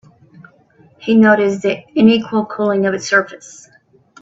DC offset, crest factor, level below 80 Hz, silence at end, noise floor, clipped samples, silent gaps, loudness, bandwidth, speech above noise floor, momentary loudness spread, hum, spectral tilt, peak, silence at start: under 0.1%; 16 dB; -58 dBFS; 0.85 s; -50 dBFS; under 0.1%; none; -14 LUFS; 7.8 kHz; 36 dB; 12 LU; none; -5.5 dB/octave; 0 dBFS; 1 s